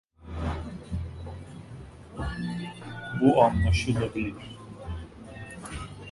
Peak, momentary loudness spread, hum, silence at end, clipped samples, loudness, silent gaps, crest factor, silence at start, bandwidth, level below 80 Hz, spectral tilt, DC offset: -6 dBFS; 21 LU; none; 0 s; under 0.1%; -29 LUFS; none; 24 dB; 0.2 s; 11.5 kHz; -38 dBFS; -7 dB/octave; under 0.1%